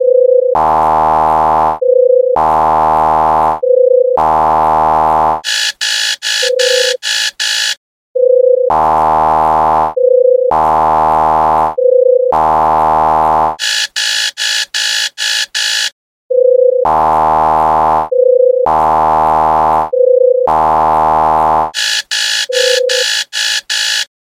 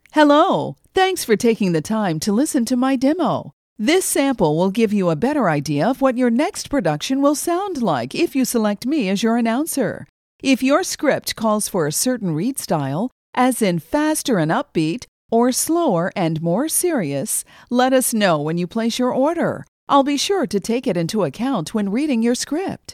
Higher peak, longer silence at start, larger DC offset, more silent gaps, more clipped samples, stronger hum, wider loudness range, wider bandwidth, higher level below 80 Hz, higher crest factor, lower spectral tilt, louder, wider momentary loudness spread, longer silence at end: about the same, 0 dBFS vs 0 dBFS; second, 0 s vs 0.15 s; neither; second, 7.77-8.15 s, 15.92-16.30 s vs 3.53-3.76 s, 10.09-10.39 s, 13.12-13.33 s, 15.08-15.29 s, 19.68-19.87 s; neither; neither; about the same, 2 LU vs 2 LU; about the same, 16 kHz vs 16.5 kHz; first, -40 dBFS vs -54 dBFS; second, 10 dB vs 18 dB; second, -2 dB/octave vs -4.5 dB/octave; first, -10 LUFS vs -19 LUFS; about the same, 4 LU vs 6 LU; first, 0.3 s vs 0 s